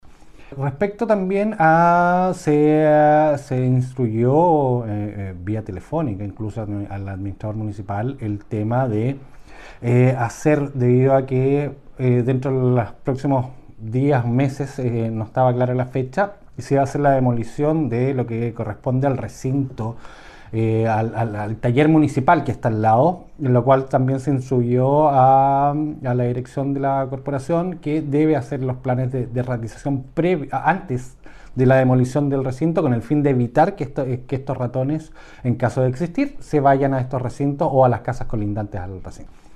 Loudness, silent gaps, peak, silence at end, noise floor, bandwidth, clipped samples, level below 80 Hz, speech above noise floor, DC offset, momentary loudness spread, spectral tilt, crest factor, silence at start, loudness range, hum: -20 LUFS; none; -4 dBFS; 0 s; -41 dBFS; 10 kHz; under 0.1%; -44 dBFS; 22 dB; under 0.1%; 12 LU; -8.5 dB/octave; 16 dB; 0.05 s; 6 LU; none